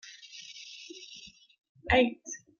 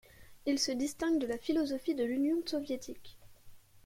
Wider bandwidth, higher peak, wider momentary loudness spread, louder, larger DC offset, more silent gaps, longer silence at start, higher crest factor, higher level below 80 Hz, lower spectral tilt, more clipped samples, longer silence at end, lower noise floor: second, 7.2 kHz vs 16.5 kHz; first, -12 dBFS vs -20 dBFS; first, 23 LU vs 9 LU; first, -27 LUFS vs -34 LUFS; neither; first, 1.69-1.75 s vs none; about the same, 0.1 s vs 0.2 s; first, 22 dB vs 16 dB; first, -52 dBFS vs -64 dBFS; about the same, -4 dB/octave vs -3 dB/octave; neither; first, 0.25 s vs 0.05 s; about the same, -52 dBFS vs -54 dBFS